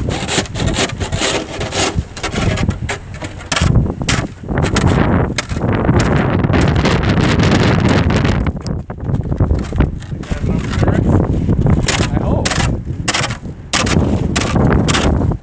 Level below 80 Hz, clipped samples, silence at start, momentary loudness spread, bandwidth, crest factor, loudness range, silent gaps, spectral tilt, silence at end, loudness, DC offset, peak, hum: -22 dBFS; under 0.1%; 0 s; 8 LU; 8 kHz; 14 dB; 4 LU; none; -5.5 dB/octave; 0 s; -15 LUFS; under 0.1%; 0 dBFS; none